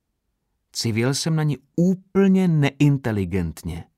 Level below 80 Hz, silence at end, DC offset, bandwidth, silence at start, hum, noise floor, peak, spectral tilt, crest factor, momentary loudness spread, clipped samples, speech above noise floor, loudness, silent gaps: -48 dBFS; 0.15 s; under 0.1%; 14.5 kHz; 0.75 s; none; -75 dBFS; -6 dBFS; -6 dB/octave; 16 dB; 9 LU; under 0.1%; 54 dB; -21 LUFS; none